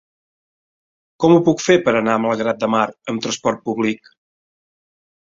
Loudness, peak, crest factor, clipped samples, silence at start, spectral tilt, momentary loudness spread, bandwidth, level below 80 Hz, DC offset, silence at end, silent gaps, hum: -18 LUFS; -2 dBFS; 18 dB; under 0.1%; 1.2 s; -5 dB/octave; 9 LU; 7.8 kHz; -58 dBFS; under 0.1%; 1.45 s; none; none